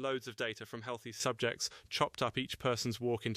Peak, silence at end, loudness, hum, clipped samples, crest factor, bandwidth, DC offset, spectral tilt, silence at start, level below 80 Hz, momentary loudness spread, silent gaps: -18 dBFS; 0 s; -37 LUFS; none; under 0.1%; 20 dB; 15.5 kHz; under 0.1%; -4 dB/octave; 0 s; -66 dBFS; 9 LU; none